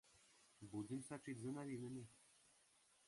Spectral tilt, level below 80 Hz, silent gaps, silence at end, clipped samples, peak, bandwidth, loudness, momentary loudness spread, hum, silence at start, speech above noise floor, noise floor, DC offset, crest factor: -6 dB/octave; -84 dBFS; none; 0.55 s; under 0.1%; -38 dBFS; 11.5 kHz; -52 LUFS; 14 LU; none; 0.05 s; 26 dB; -76 dBFS; under 0.1%; 16 dB